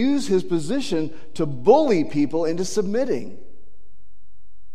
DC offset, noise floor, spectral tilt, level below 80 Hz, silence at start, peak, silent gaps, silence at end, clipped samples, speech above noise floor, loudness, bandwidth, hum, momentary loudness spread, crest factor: 5%; -59 dBFS; -6 dB/octave; -58 dBFS; 0 s; -2 dBFS; none; 1.4 s; under 0.1%; 38 dB; -22 LUFS; 14 kHz; none; 12 LU; 20 dB